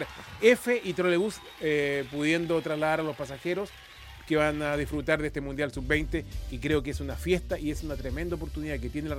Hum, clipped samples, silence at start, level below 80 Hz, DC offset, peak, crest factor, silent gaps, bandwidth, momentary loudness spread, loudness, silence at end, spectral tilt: none; under 0.1%; 0 s; -42 dBFS; under 0.1%; -6 dBFS; 22 dB; none; 17 kHz; 9 LU; -29 LUFS; 0 s; -5.5 dB/octave